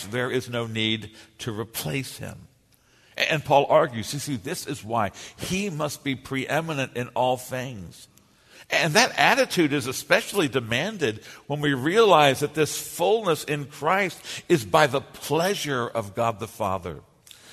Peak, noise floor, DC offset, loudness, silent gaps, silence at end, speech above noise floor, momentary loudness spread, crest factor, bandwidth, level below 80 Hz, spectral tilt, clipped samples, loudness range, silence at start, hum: -2 dBFS; -60 dBFS; under 0.1%; -24 LUFS; none; 0 s; 36 dB; 14 LU; 24 dB; 13.5 kHz; -60 dBFS; -4 dB/octave; under 0.1%; 6 LU; 0 s; none